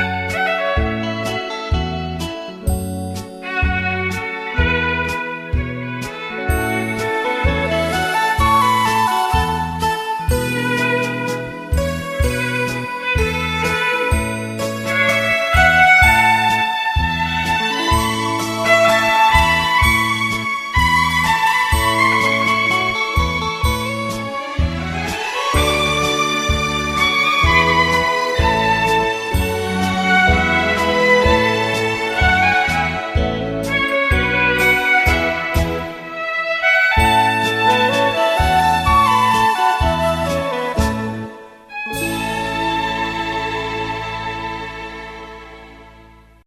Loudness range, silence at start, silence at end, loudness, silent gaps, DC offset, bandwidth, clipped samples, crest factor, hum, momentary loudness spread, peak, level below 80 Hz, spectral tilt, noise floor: 7 LU; 0 s; 0.45 s; -16 LUFS; none; under 0.1%; 15.5 kHz; under 0.1%; 18 dB; none; 11 LU; 0 dBFS; -30 dBFS; -4.5 dB/octave; -45 dBFS